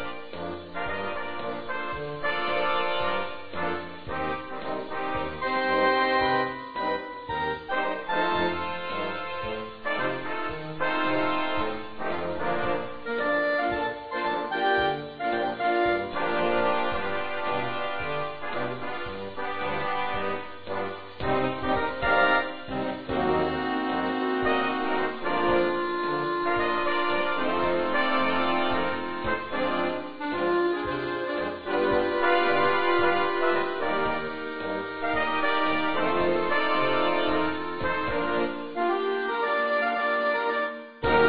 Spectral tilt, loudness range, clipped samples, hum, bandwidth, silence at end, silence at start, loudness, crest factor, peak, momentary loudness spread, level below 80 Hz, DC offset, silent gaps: -7.5 dB/octave; 4 LU; under 0.1%; none; 5.2 kHz; 0 s; 0 s; -27 LUFS; 18 dB; -10 dBFS; 9 LU; -52 dBFS; 1%; none